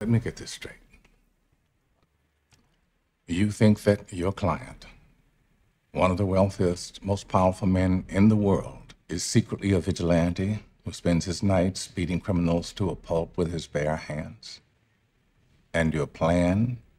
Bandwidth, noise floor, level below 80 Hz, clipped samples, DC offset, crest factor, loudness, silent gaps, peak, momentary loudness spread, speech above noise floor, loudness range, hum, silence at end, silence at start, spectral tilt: 13 kHz; -71 dBFS; -50 dBFS; under 0.1%; under 0.1%; 20 dB; -26 LUFS; none; -6 dBFS; 14 LU; 46 dB; 6 LU; none; 0.2 s; 0 s; -6.5 dB/octave